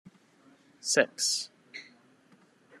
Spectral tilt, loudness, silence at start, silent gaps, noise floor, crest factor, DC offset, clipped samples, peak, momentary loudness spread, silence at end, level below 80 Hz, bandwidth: -0.5 dB/octave; -28 LUFS; 0.05 s; none; -62 dBFS; 28 dB; under 0.1%; under 0.1%; -8 dBFS; 21 LU; 0.95 s; under -90 dBFS; 13 kHz